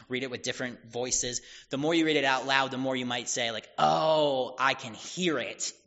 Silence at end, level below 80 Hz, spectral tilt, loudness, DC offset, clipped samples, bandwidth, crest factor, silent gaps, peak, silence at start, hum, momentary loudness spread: 0.15 s; -62 dBFS; -2 dB/octave; -28 LUFS; under 0.1%; under 0.1%; 8 kHz; 22 dB; none; -6 dBFS; 0 s; none; 11 LU